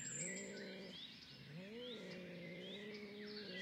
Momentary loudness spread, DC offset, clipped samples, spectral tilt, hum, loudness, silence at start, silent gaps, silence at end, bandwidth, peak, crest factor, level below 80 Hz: 8 LU; under 0.1%; under 0.1%; -3 dB/octave; none; -50 LUFS; 0 s; none; 0 s; 15.5 kHz; -34 dBFS; 18 dB; -84 dBFS